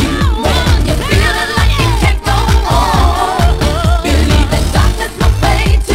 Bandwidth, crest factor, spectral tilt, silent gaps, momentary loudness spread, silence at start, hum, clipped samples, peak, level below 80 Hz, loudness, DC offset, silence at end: 16 kHz; 10 dB; -5 dB/octave; none; 2 LU; 0 s; none; 0.2%; 0 dBFS; -14 dBFS; -12 LUFS; under 0.1%; 0 s